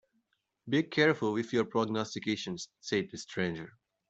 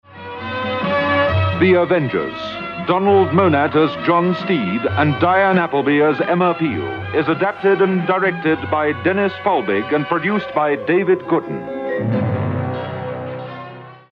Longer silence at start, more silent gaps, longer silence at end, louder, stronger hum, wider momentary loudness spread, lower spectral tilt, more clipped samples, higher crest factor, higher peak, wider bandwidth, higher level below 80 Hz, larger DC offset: first, 0.65 s vs 0.1 s; neither; first, 0.4 s vs 0.15 s; second, -32 LUFS vs -17 LUFS; neither; about the same, 12 LU vs 11 LU; second, -5 dB/octave vs -9 dB/octave; neither; first, 22 dB vs 16 dB; second, -12 dBFS vs -2 dBFS; first, 8.2 kHz vs 6.2 kHz; second, -72 dBFS vs -52 dBFS; neither